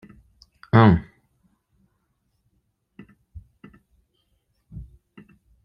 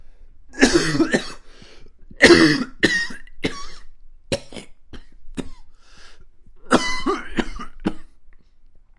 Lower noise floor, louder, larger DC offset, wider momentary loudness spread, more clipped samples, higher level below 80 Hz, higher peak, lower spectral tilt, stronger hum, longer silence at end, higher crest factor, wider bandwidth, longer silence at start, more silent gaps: first, -72 dBFS vs -46 dBFS; about the same, -18 LUFS vs -19 LUFS; neither; first, 28 LU vs 23 LU; neither; second, -48 dBFS vs -38 dBFS; about the same, -2 dBFS vs 0 dBFS; first, -10 dB/octave vs -4 dB/octave; neither; first, 0.8 s vs 0.65 s; about the same, 26 dB vs 22 dB; second, 5.6 kHz vs 11.5 kHz; first, 0.75 s vs 0 s; neither